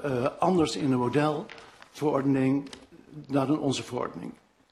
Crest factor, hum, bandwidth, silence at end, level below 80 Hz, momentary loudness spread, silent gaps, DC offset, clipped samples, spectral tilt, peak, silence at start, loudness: 16 dB; none; 12.5 kHz; 0.4 s; -62 dBFS; 21 LU; none; under 0.1%; under 0.1%; -6.5 dB/octave; -12 dBFS; 0 s; -27 LUFS